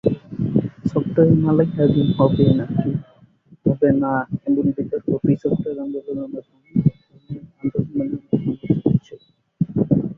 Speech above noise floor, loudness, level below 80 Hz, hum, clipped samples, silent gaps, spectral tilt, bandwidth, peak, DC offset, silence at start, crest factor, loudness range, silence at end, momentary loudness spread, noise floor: 32 dB; -20 LUFS; -48 dBFS; none; under 0.1%; none; -11 dB/octave; 4.3 kHz; -2 dBFS; under 0.1%; 0.05 s; 18 dB; 6 LU; 0.05 s; 12 LU; -51 dBFS